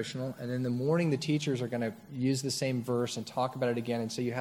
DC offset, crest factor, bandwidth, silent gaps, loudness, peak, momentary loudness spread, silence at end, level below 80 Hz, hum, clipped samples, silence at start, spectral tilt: under 0.1%; 16 dB; 16.5 kHz; none; -32 LUFS; -16 dBFS; 6 LU; 0 s; -72 dBFS; none; under 0.1%; 0 s; -5.5 dB/octave